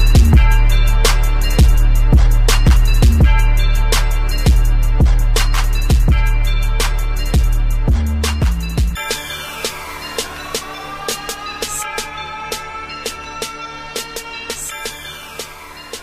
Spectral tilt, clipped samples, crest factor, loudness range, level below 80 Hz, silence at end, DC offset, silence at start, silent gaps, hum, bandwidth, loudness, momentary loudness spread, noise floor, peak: -4.5 dB/octave; under 0.1%; 14 dB; 10 LU; -14 dBFS; 0 s; under 0.1%; 0 s; none; none; 15.5 kHz; -17 LUFS; 13 LU; -34 dBFS; 0 dBFS